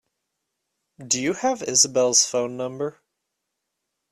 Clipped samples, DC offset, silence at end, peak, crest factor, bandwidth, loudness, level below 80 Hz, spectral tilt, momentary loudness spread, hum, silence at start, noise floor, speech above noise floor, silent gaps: under 0.1%; under 0.1%; 1.2 s; -4 dBFS; 22 dB; 13.5 kHz; -20 LUFS; -68 dBFS; -1.5 dB/octave; 12 LU; none; 1 s; -80 dBFS; 58 dB; none